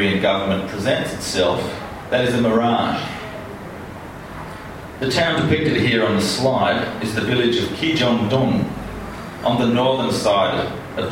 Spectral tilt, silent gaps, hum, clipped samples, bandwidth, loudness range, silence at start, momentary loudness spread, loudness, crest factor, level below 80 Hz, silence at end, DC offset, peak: -5 dB/octave; none; none; under 0.1%; 16.5 kHz; 4 LU; 0 s; 16 LU; -19 LUFS; 16 dB; -44 dBFS; 0 s; under 0.1%; -4 dBFS